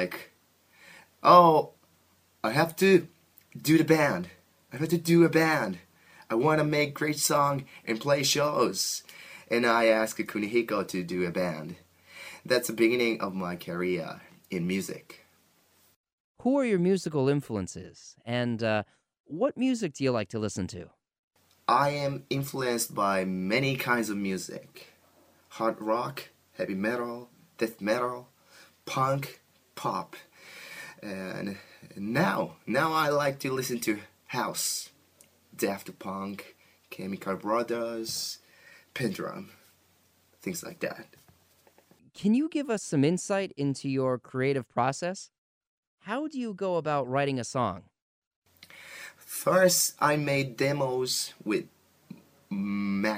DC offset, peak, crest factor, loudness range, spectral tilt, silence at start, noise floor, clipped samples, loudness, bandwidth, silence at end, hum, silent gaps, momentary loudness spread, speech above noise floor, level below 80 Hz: under 0.1%; -4 dBFS; 24 dB; 8 LU; -4.5 dB/octave; 0 s; -66 dBFS; under 0.1%; -28 LUFS; 15.5 kHz; 0 s; none; 15.96-16.04 s, 16.13-16.35 s, 19.20-19.24 s, 21.19-21.28 s, 45.38-45.61 s, 45.67-45.98 s, 48.02-48.42 s; 19 LU; 38 dB; -70 dBFS